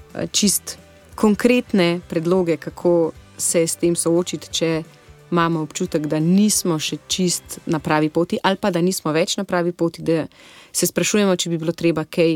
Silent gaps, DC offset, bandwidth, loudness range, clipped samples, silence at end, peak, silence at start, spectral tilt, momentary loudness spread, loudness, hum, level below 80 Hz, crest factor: none; under 0.1%; 17.5 kHz; 2 LU; under 0.1%; 0 s; -2 dBFS; 0.15 s; -4.5 dB/octave; 7 LU; -20 LUFS; none; -54 dBFS; 18 dB